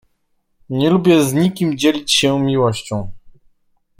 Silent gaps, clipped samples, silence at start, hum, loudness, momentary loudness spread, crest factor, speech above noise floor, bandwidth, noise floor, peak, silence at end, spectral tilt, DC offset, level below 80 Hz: none; under 0.1%; 0.7 s; none; -16 LUFS; 13 LU; 16 dB; 50 dB; 16.5 kHz; -65 dBFS; -2 dBFS; 0.7 s; -5 dB/octave; under 0.1%; -48 dBFS